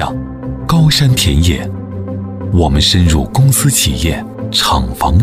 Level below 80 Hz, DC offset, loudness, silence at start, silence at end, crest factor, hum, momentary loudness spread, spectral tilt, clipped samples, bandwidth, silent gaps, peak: -22 dBFS; under 0.1%; -12 LUFS; 0 s; 0 s; 12 dB; none; 13 LU; -4.5 dB/octave; under 0.1%; 16 kHz; none; 0 dBFS